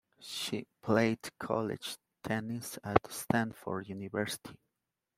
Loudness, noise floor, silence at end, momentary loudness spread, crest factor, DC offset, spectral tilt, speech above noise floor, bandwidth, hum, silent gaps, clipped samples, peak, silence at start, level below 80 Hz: -35 LUFS; -87 dBFS; 0.65 s; 12 LU; 28 dB; under 0.1%; -5 dB/octave; 53 dB; 16 kHz; none; none; under 0.1%; -8 dBFS; 0.2 s; -64 dBFS